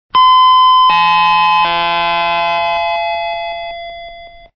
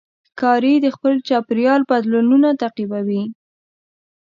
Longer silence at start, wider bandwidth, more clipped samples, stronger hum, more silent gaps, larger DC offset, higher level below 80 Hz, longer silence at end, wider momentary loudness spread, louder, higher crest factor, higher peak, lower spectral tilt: second, 0.15 s vs 0.35 s; second, 6.4 kHz vs 7.2 kHz; neither; neither; neither; neither; first, -46 dBFS vs -70 dBFS; second, 0.3 s vs 1 s; first, 17 LU vs 8 LU; first, -11 LUFS vs -17 LUFS; about the same, 12 dB vs 16 dB; about the same, -2 dBFS vs -2 dBFS; second, -3.5 dB/octave vs -7.5 dB/octave